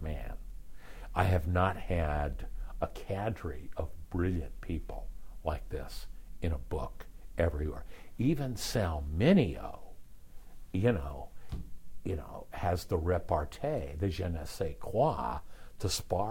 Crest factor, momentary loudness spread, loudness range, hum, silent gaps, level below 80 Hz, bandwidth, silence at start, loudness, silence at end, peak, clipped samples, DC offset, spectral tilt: 22 dB; 17 LU; 6 LU; none; none; -44 dBFS; 16 kHz; 0 s; -34 LUFS; 0 s; -12 dBFS; under 0.1%; under 0.1%; -6.5 dB/octave